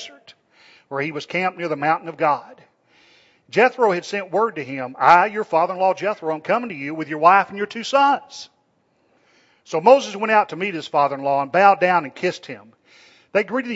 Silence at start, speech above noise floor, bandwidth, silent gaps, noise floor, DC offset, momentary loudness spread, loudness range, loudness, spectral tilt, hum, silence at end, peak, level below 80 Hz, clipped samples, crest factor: 0 s; 45 dB; 8 kHz; none; -64 dBFS; under 0.1%; 13 LU; 4 LU; -19 LUFS; -5 dB/octave; none; 0 s; 0 dBFS; -72 dBFS; under 0.1%; 20 dB